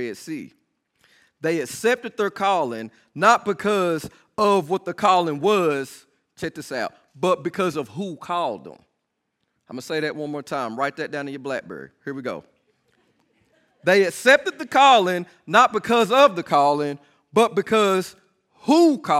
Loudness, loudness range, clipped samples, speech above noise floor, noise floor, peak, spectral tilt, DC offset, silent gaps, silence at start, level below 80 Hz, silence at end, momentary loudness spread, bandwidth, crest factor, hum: -21 LUFS; 12 LU; under 0.1%; 56 dB; -76 dBFS; -2 dBFS; -4.5 dB/octave; under 0.1%; none; 0 s; -68 dBFS; 0 s; 16 LU; 15.5 kHz; 20 dB; none